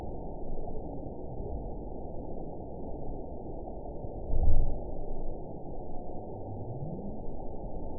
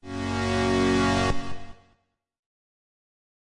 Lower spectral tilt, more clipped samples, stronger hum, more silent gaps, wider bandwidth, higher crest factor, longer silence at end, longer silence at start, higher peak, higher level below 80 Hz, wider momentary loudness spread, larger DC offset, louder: first, -15.5 dB/octave vs -5.5 dB/octave; neither; neither; neither; second, 1 kHz vs 11.5 kHz; first, 20 dB vs 14 dB; second, 0 s vs 1.65 s; about the same, 0 s vs 0.05 s; about the same, -10 dBFS vs -12 dBFS; first, -34 dBFS vs -42 dBFS; second, 9 LU vs 15 LU; first, 0.7% vs under 0.1%; second, -40 LUFS vs -25 LUFS